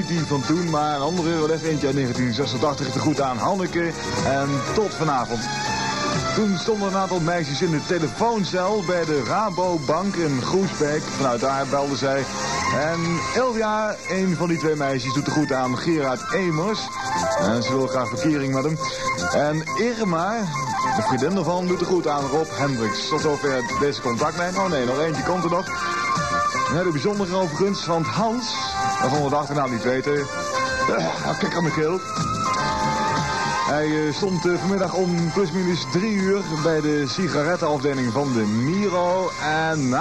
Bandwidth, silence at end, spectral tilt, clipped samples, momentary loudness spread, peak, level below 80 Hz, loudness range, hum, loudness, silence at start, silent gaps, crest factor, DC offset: 13 kHz; 0 s; -5 dB/octave; under 0.1%; 2 LU; -8 dBFS; -50 dBFS; 1 LU; none; -22 LUFS; 0 s; none; 12 dB; 0.3%